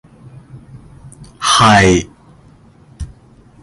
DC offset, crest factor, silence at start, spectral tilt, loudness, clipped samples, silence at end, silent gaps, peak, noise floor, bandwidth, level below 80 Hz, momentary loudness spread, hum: under 0.1%; 16 dB; 0.55 s; -4 dB/octave; -10 LUFS; under 0.1%; 0.55 s; none; 0 dBFS; -45 dBFS; 11.5 kHz; -36 dBFS; 25 LU; none